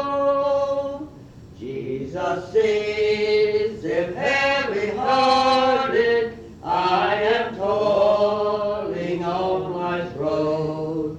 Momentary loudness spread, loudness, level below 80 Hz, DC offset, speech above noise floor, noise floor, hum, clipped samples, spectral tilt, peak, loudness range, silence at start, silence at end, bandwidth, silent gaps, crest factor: 10 LU; -21 LUFS; -52 dBFS; under 0.1%; 21 dB; -42 dBFS; none; under 0.1%; -5.5 dB/octave; -8 dBFS; 4 LU; 0 s; 0 s; 9 kHz; none; 14 dB